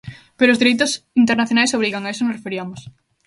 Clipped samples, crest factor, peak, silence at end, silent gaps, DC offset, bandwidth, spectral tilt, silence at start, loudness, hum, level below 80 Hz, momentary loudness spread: under 0.1%; 18 dB; 0 dBFS; 0.35 s; none; under 0.1%; 11.5 kHz; -3.5 dB/octave; 0.05 s; -17 LUFS; none; -58 dBFS; 13 LU